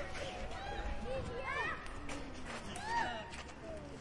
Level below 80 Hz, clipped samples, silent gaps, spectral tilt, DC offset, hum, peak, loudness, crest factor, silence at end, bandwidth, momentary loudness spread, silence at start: -50 dBFS; under 0.1%; none; -4 dB/octave; under 0.1%; none; -24 dBFS; -42 LUFS; 18 dB; 0 s; 11.5 kHz; 10 LU; 0 s